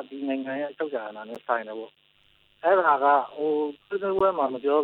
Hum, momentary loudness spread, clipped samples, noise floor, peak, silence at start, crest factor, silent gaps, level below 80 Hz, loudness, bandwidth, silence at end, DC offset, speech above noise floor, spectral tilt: none; 17 LU; under 0.1%; -62 dBFS; -8 dBFS; 0 s; 18 dB; none; -68 dBFS; -25 LUFS; 4.6 kHz; 0 s; under 0.1%; 37 dB; -7.5 dB/octave